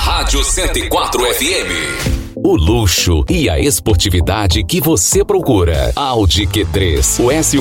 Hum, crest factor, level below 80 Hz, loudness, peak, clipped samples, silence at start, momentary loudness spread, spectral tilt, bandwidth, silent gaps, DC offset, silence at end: none; 12 dB; -22 dBFS; -13 LUFS; 0 dBFS; under 0.1%; 0 s; 4 LU; -4 dB/octave; 17 kHz; none; under 0.1%; 0 s